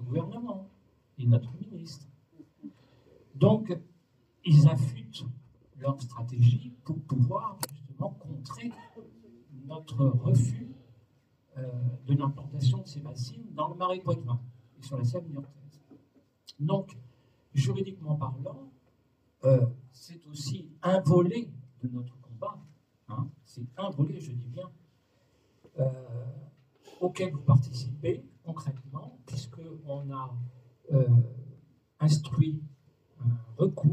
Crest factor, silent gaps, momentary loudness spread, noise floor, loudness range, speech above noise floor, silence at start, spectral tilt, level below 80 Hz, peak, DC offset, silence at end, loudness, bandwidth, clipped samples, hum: 20 dB; none; 21 LU; -69 dBFS; 9 LU; 40 dB; 0 s; -8 dB/octave; -66 dBFS; -10 dBFS; under 0.1%; 0 s; -30 LUFS; 13 kHz; under 0.1%; none